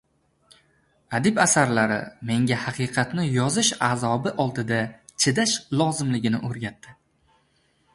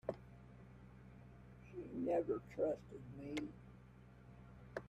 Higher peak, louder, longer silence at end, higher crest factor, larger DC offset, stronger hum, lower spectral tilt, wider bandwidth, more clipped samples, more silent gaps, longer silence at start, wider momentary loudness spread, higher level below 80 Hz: first, -4 dBFS vs -26 dBFS; first, -23 LUFS vs -44 LUFS; first, 1.05 s vs 0 s; about the same, 20 dB vs 20 dB; neither; neither; second, -4 dB/octave vs -7 dB/octave; second, 11.5 kHz vs 13 kHz; neither; neither; first, 1.1 s vs 0.05 s; second, 9 LU vs 21 LU; first, -60 dBFS vs -66 dBFS